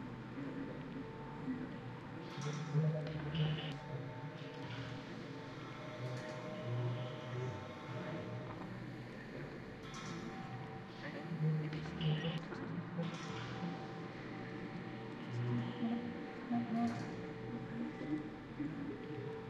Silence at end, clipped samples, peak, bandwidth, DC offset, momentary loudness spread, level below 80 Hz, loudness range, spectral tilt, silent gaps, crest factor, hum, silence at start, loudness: 0 s; under 0.1%; -26 dBFS; 8.2 kHz; under 0.1%; 10 LU; -66 dBFS; 5 LU; -7 dB/octave; none; 16 dB; none; 0 s; -43 LUFS